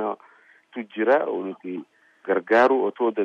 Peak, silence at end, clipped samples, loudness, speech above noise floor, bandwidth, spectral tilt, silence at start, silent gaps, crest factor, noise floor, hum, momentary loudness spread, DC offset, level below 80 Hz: -6 dBFS; 0 s; under 0.1%; -22 LUFS; 33 dB; 7.6 kHz; -6.5 dB/octave; 0 s; none; 18 dB; -55 dBFS; none; 19 LU; under 0.1%; -72 dBFS